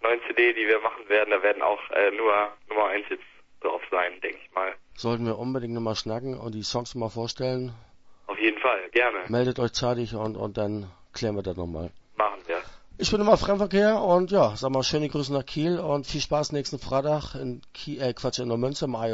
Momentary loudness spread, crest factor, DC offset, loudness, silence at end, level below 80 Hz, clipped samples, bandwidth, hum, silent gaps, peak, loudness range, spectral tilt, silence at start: 12 LU; 22 dB; under 0.1%; -26 LUFS; 0 s; -50 dBFS; under 0.1%; 8 kHz; none; none; -4 dBFS; 6 LU; -5 dB/octave; 0 s